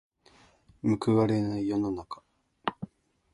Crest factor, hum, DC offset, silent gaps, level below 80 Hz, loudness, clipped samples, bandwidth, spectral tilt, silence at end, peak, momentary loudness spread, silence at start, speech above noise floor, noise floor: 20 dB; none; under 0.1%; none; -60 dBFS; -29 LUFS; under 0.1%; 11.5 kHz; -8 dB/octave; 0.5 s; -10 dBFS; 20 LU; 0.85 s; 34 dB; -61 dBFS